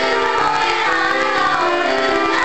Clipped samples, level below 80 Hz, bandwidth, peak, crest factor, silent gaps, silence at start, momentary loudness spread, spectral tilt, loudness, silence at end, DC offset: under 0.1%; -48 dBFS; 8.8 kHz; -2 dBFS; 16 dB; none; 0 s; 1 LU; -3 dB/octave; -16 LUFS; 0 s; 2%